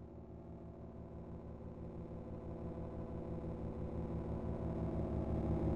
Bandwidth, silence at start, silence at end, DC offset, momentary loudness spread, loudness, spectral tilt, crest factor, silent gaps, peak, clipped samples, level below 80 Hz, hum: 5.4 kHz; 0 s; 0 s; under 0.1%; 13 LU; -45 LUFS; -10.5 dB/octave; 18 dB; none; -26 dBFS; under 0.1%; -50 dBFS; none